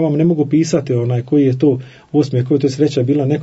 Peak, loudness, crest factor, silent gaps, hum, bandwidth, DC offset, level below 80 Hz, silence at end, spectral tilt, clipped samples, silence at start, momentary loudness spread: -2 dBFS; -15 LUFS; 12 dB; none; none; 8 kHz; under 0.1%; -56 dBFS; 0 s; -8 dB/octave; under 0.1%; 0 s; 4 LU